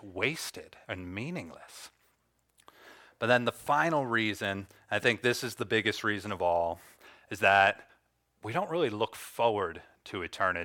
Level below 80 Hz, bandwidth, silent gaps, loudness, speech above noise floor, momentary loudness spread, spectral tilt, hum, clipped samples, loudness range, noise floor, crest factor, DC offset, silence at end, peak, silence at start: -68 dBFS; 18 kHz; none; -30 LUFS; 43 dB; 17 LU; -4.5 dB/octave; none; under 0.1%; 5 LU; -73 dBFS; 22 dB; under 0.1%; 0 s; -10 dBFS; 0.05 s